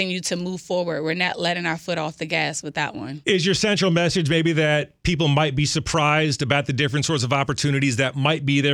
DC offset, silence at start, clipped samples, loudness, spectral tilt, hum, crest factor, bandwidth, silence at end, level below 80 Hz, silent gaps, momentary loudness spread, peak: under 0.1%; 0 s; under 0.1%; -21 LUFS; -4.5 dB/octave; none; 20 dB; 12 kHz; 0 s; -46 dBFS; none; 7 LU; -2 dBFS